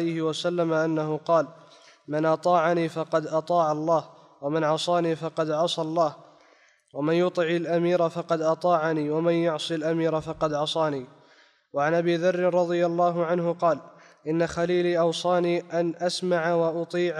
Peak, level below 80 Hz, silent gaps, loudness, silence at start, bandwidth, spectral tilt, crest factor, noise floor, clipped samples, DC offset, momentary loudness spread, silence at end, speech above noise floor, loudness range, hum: -10 dBFS; -66 dBFS; none; -25 LUFS; 0 s; 11 kHz; -6 dB/octave; 16 dB; -60 dBFS; under 0.1%; under 0.1%; 5 LU; 0 s; 35 dB; 2 LU; none